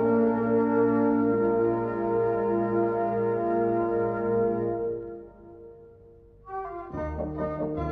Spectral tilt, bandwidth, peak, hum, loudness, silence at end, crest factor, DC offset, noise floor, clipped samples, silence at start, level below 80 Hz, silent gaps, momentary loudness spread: -11 dB/octave; 3.6 kHz; -12 dBFS; none; -26 LUFS; 0 s; 14 dB; under 0.1%; -52 dBFS; under 0.1%; 0 s; -48 dBFS; none; 13 LU